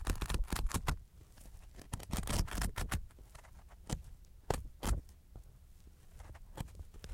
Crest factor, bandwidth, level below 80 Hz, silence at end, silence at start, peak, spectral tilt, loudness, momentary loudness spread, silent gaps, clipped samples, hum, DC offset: 24 dB; 17 kHz; -42 dBFS; 0 s; 0 s; -16 dBFS; -4.5 dB/octave; -41 LUFS; 21 LU; none; under 0.1%; none; under 0.1%